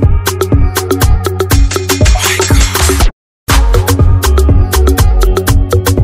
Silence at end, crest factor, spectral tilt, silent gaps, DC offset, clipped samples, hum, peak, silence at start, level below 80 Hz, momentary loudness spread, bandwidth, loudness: 0 s; 8 dB; -4.5 dB/octave; 3.13-3.46 s; under 0.1%; 1%; none; 0 dBFS; 0 s; -10 dBFS; 4 LU; 16.5 kHz; -10 LUFS